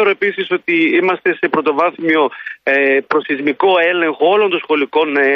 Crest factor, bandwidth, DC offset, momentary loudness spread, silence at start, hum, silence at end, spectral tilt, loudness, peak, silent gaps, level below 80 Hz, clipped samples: 12 dB; 6 kHz; under 0.1%; 5 LU; 0 s; none; 0 s; -6.5 dB/octave; -14 LUFS; -2 dBFS; none; -66 dBFS; under 0.1%